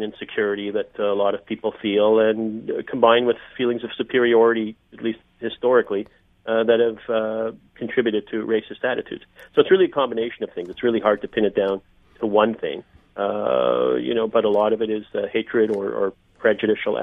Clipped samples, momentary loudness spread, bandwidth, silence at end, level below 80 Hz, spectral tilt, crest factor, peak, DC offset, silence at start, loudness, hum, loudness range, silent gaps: under 0.1%; 12 LU; 3.9 kHz; 0 s; -60 dBFS; -8 dB/octave; 20 dB; -2 dBFS; under 0.1%; 0 s; -22 LUFS; none; 3 LU; none